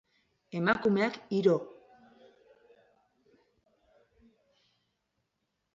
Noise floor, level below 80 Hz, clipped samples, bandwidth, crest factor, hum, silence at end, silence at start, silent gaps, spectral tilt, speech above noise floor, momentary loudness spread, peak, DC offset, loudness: -82 dBFS; -74 dBFS; under 0.1%; 7.6 kHz; 22 dB; none; 4.05 s; 0.55 s; none; -7 dB/octave; 54 dB; 11 LU; -12 dBFS; under 0.1%; -29 LUFS